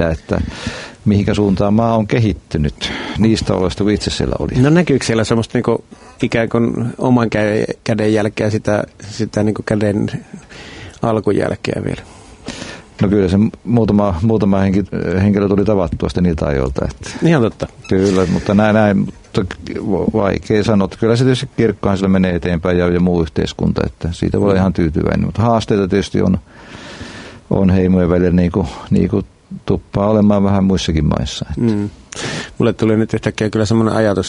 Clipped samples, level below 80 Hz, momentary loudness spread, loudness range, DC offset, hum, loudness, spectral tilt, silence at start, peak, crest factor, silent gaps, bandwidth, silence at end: under 0.1%; -34 dBFS; 10 LU; 3 LU; under 0.1%; none; -16 LUFS; -7 dB/octave; 0 s; 0 dBFS; 14 dB; none; 11 kHz; 0 s